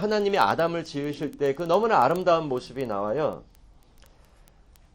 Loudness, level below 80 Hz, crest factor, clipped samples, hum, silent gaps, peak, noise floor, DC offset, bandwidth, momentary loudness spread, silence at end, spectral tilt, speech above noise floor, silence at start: -25 LUFS; -56 dBFS; 20 dB; under 0.1%; none; none; -6 dBFS; -55 dBFS; under 0.1%; 17 kHz; 10 LU; 1.5 s; -6 dB/octave; 30 dB; 0 s